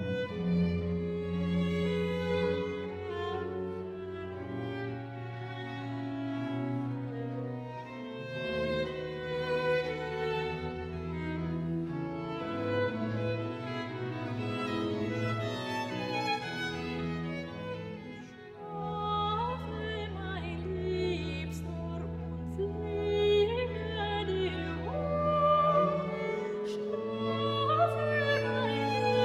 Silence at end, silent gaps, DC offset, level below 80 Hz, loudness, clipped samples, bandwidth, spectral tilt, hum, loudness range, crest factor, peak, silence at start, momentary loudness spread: 0 s; none; under 0.1%; -52 dBFS; -33 LUFS; under 0.1%; 12 kHz; -7 dB/octave; none; 7 LU; 16 dB; -16 dBFS; 0 s; 11 LU